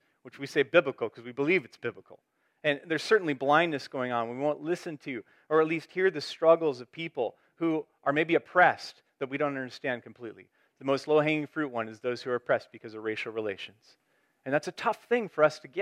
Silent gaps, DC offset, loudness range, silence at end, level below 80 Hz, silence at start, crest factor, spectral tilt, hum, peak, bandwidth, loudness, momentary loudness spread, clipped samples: none; under 0.1%; 4 LU; 0 s; -84 dBFS; 0.25 s; 22 dB; -5.5 dB/octave; none; -8 dBFS; 12.5 kHz; -29 LUFS; 14 LU; under 0.1%